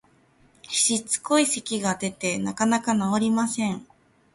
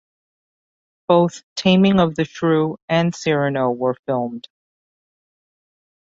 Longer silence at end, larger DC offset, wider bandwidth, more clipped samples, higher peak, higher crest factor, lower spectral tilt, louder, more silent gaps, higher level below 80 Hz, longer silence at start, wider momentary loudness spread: second, 0.5 s vs 1.65 s; neither; first, 11.5 kHz vs 7.8 kHz; neither; second, -8 dBFS vs -2 dBFS; about the same, 18 dB vs 20 dB; second, -3 dB/octave vs -6.5 dB/octave; second, -24 LUFS vs -19 LUFS; second, none vs 1.43-1.56 s, 2.82-2.88 s, 3.99-4.03 s; second, -64 dBFS vs -54 dBFS; second, 0.7 s vs 1.1 s; second, 6 LU vs 9 LU